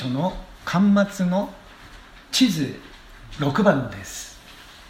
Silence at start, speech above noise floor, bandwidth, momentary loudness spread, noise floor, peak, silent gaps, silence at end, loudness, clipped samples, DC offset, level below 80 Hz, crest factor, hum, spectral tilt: 0 s; 24 dB; 16 kHz; 21 LU; -45 dBFS; -4 dBFS; none; 0 s; -22 LUFS; under 0.1%; under 0.1%; -46 dBFS; 20 dB; none; -5.5 dB/octave